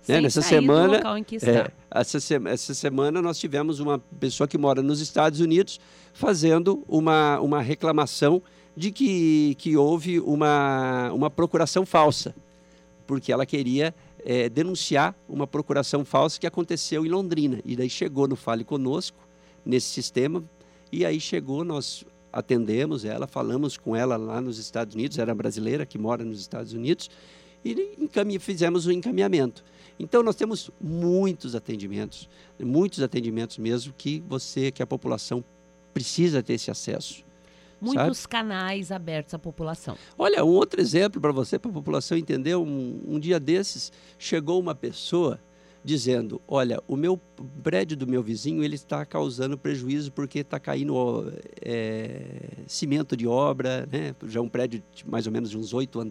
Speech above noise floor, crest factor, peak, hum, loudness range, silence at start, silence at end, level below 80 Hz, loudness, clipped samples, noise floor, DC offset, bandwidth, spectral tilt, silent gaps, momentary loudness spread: 30 dB; 20 dB; -4 dBFS; none; 7 LU; 0.05 s; 0 s; -62 dBFS; -25 LUFS; under 0.1%; -54 dBFS; under 0.1%; 13.5 kHz; -5.5 dB/octave; none; 12 LU